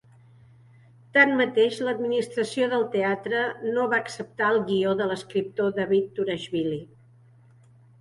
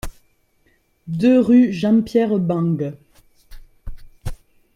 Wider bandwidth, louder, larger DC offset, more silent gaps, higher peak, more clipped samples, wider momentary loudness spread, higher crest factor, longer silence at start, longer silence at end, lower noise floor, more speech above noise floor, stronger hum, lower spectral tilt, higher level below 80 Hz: second, 11.5 kHz vs 13 kHz; second, -25 LUFS vs -17 LUFS; neither; neither; about the same, -4 dBFS vs -4 dBFS; neither; second, 9 LU vs 22 LU; first, 22 dB vs 16 dB; first, 1.15 s vs 0.05 s; first, 1.15 s vs 0.4 s; second, -55 dBFS vs -61 dBFS; second, 30 dB vs 45 dB; neither; second, -5.5 dB/octave vs -8 dB/octave; second, -68 dBFS vs -40 dBFS